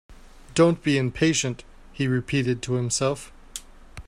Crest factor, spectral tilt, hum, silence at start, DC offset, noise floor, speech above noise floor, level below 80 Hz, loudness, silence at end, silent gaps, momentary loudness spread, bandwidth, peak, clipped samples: 20 dB; -5 dB/octave; none; 0.1 s; under 0.1%; -43 dBFS; 20 dB; -48 dBFS; -24 LUFS; 0.05 s; none; 18 LU; 14.5 kHz; -6 dBFS; under 0.1%